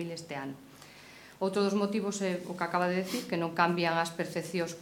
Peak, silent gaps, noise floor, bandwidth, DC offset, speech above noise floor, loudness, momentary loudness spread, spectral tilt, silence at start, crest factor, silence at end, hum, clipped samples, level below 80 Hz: -10 dBFS; none; -52 dBFS; 17 kHz; under 0.1%; 21 dB; -31 LUFS; 21 LU; -5 dB/octave; 0 s; 22 dB; 0 s; none; under 0.1%; -72 dBFS